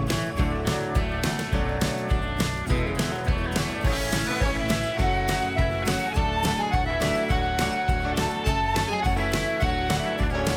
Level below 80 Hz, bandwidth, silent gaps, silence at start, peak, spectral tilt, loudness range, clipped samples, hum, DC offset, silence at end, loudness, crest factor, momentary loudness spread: -30 dBFS; 18.5 kHz; none; 0 s; -10 dBFS; -5 dB/octave; 1 LU; under 0.1%; none; under 0.1%; 0 s; -25 LUFS; 14 dB; 2 LU